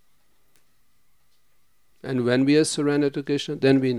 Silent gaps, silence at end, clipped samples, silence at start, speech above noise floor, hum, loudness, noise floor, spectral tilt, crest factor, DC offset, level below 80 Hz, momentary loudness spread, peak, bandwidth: none; 0 s; under 0.1%; 2.05 s; 47 dB; none; -22 LUFS; -68 dBFS; -5.5 dB/octave; 18 dB; 0.2%; -70 dBFS; 8 LU; -6 dBFS; 12 kHz